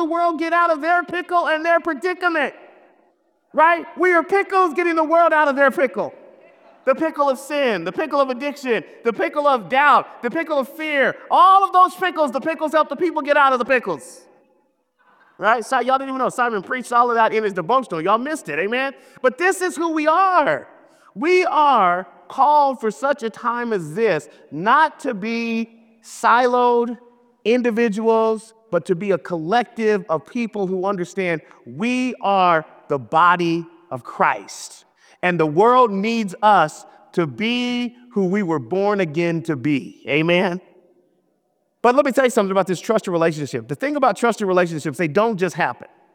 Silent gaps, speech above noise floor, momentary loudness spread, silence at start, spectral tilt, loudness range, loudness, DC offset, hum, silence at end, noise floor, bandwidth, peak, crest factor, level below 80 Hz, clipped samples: none; 49 dB; 10 LU; 0 s; -5 dB/octave; 4 LU; -19 LUFS; under 0.1%; none; 0.3 s; -68 dBFS; 16.5 kHz; -4 dBFS; 16 dB; -72 dBFS; under 0.1%